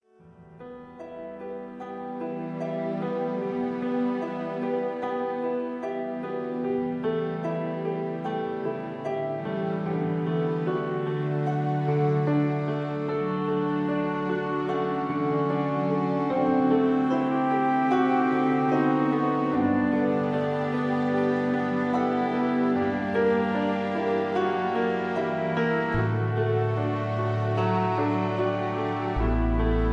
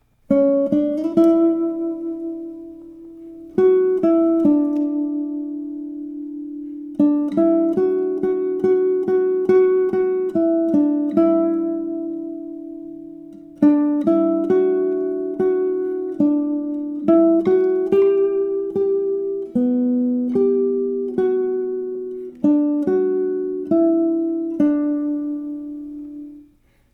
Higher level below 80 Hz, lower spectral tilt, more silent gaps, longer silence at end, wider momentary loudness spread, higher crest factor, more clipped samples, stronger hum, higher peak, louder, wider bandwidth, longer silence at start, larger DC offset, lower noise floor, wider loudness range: first, -42 dBFS vs -60 dBFS; about the same, -9 dB/octave vs -10 dB/octave; neither; second, 0 s vs 0.5 s; second, 8 LU vs 15 LU; about the same, 16 dB vs 16 dB; neither; neither; second, -10 dBFS vs -4 dBFS; second, -26 LUFS vs -19 LUFS; first, 7.2 kHz vs 4 kHz; about the same, 0.25 s vs 0.3 s; neither; about the same, -52 dBFS vs -55 dBFS; first, 6 LU vs 3 LU